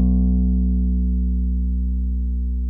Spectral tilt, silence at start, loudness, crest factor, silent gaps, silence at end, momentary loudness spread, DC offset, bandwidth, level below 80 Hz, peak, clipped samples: -14 dB/octave; 0 s; -22 LUFS; 10 dB; none; 0 s; 5 LU; under 0.1%; 0.9 kHz; -20 dBFS; -10 dBFS; under 0.1%